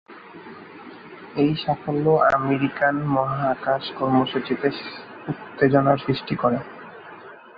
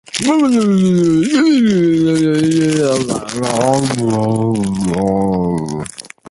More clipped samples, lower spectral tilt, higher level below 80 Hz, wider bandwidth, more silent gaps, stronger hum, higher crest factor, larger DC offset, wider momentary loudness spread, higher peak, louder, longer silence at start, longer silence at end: neither; first, -9 dB/octave vs -6 dB/octave; second, -58 dBFS vs -44 dBFS; second, 5.6 kHz vs 11.5 kHz; neither; neither; first, 20 dB vs 12 dB; neither; first, 23 LU vs 7 LU; second, -4 dBFS vs 0 dBFS; second, -22 LUFS vs -14 LUFS; about the same, 0.1 s vs 0.15 s; about the same, 0.2 s vs 0.25 s